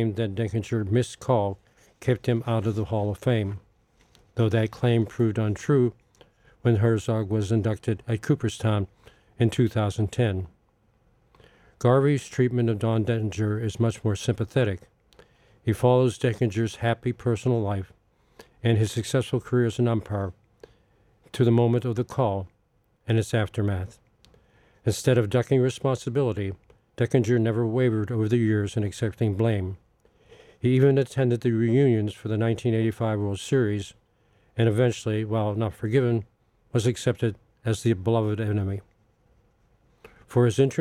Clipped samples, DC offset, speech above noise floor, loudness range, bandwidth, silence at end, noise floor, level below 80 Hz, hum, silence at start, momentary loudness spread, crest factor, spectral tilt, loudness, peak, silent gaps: under 0.1%; under 0.1%; 43 dB; 3 LU; 12.5 kHz; 0 s; -67 dBFS; -56 dBFS; none; 0 s; 9 LU; 18 dB; -7 dB/octave; -25 LUFS; -6 dBFS; none